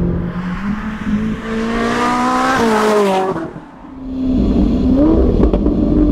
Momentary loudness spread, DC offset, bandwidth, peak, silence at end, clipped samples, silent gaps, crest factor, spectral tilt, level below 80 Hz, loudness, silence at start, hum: 10 LU; under 0.1%; 15 kHz; -2 dBFS; 0 s; under 0.1%; none; 12 dB; -6.5 dB/octave; -22 dBFS; -15 LUFS; 0 s; none